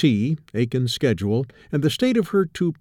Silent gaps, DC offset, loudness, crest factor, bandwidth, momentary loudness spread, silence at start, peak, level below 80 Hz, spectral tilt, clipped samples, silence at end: none; under 0.1%; -22 LUFS; 14 dB; 17 kHz; 5 LU; 0 s; -8 dBFS; -54 dBFS; -6.5 dB/octave; under 0.1%; 0.05 s